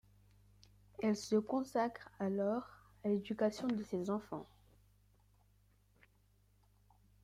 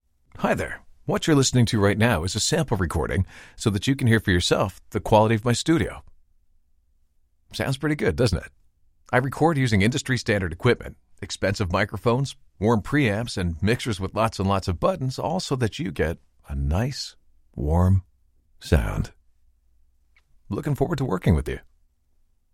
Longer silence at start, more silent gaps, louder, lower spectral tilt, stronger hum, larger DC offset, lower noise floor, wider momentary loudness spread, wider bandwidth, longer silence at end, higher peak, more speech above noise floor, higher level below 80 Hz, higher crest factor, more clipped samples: first, 1 s vs 0.35 s; neither; second, -38 LUFS vs -24 LUFS; about the same, -6.5 dB/octave vs -5.5 dB/octave; first, 50 Hz at -65 dBFS vs none; neither; first, -71 dBFS vs -63 dBFS; about the same, 10 LU vs 12 LU; second, 14 kHz vs 16 kHz; first, 2.8 s vs 0.95 s; second, -22 dBFS vs -4 dBFS; second, 34 dB vs 40 dB; second, -72 dBFS vs -38 dBFS; about the same, 18 dB vs 20 dB; neither